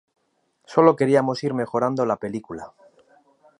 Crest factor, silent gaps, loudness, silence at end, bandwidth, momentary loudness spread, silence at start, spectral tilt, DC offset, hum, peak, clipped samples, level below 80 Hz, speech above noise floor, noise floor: 22 dB; none; -21 LUFS; 0.9 s; 10.5 kHz; 16 LU; 0.7 s; -7 dB/octave; under 0.1%; none; -2 dBFS; under 0.1%; -66 dBFS; 48 dB; -69 dBFS